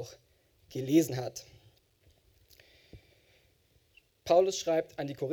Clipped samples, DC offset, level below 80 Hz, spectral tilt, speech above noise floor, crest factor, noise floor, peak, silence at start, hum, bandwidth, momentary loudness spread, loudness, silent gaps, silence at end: under 0.1%; under 0.1%; -68 dBFS; -5.5 dB/octave; 39 dB; 22 dB; -68 dBFS; -12 dBFS; 0 s; none; 18.5 kHz; 20 LU; -30 LUFS; none; 0 s